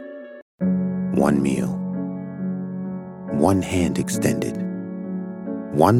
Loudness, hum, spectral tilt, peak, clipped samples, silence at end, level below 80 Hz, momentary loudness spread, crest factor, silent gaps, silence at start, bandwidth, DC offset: -24 LUFS; none; -7 dB/octave; 0 dBFS; under 0.1%; 0 s; -52 dBFS; 11 LU; 22 dB; 0.42-0.58 s; 0 s; 15.5 kHz; under 0.1%